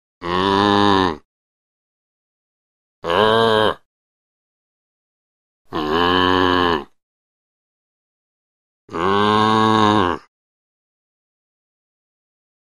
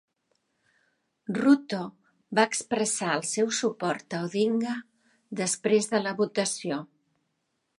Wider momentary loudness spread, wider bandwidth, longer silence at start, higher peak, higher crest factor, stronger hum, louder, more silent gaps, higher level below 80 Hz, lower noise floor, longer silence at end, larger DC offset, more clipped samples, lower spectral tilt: first, 14 LU vs 11 LU; first, 13 kHz vs 11.5 kHz; second, 0.2 s vs 1.3 s; first, 0 dBFS vs -6 dBFS; about the same, 20 dB vs 22 dB; neither; first, -17 LUFS vs -27 LUFS; first, 1.25-3.02 s, 3.85-5.65 s, 7.03-8.88 s vs none; first, -50 dBFS vs -78 dBFS; first, under -90 dBFS vs -78 dBFS; first, 2.6 s vs 0.95 s; first, 0.4% vs under 0.1%; neither; first, -5.5 dB/octave vs -3.5 dB/octave